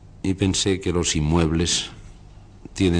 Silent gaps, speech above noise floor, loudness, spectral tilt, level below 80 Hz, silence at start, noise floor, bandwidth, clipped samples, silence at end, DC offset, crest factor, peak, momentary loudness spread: none; 23 dB; -22 LUFS; -4.5 dB/octave; -36 dBFS; 0 s; -45 dBFS; 10.5 kHz; under 0.1%; 0 s; under 0.1%; 16 dB; -6 dBFS; 8 LU